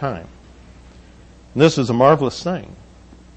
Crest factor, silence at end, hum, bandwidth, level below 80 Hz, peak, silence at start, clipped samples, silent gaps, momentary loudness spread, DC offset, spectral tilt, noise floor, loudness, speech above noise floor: 20 dB; 0.6 s; none; 8.6 kHz; -46 dBFS; 0 dBFS; 0 s; under 0.1%; none; 15 LU; under 0.1%; -6 dB/octave; -45 dBFS; -17 LUFS; 28 dB